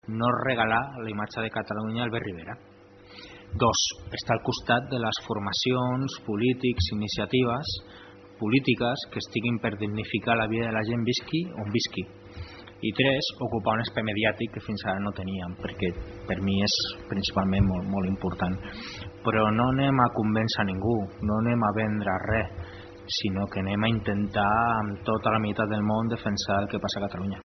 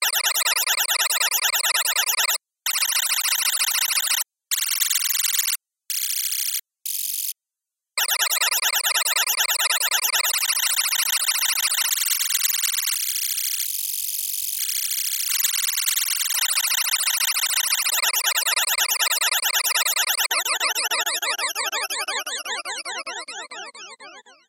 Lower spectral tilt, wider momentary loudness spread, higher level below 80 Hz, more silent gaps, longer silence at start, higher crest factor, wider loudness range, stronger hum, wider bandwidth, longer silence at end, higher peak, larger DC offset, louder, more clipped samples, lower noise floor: first, -4.5 dB/octave vs 6 dB/octave; first, 11 LU vs 8 LU; first, -50 dBFS vs -90 dBFS; neither; about the same, 0.05 s vs 0 s; about the same, 22 dB vs 18 dB; about the same, 3 LU vs 4 LU; neither; second, 6.4 kHz vs 17.5 kHz; second, 0 s vs 0.2 s; about the same, -6 dBFS vs -6 dBFS; neither; second, -27 LUFS vs -20 LUFS; neither; second, -48 dBFS vs -87 dBFS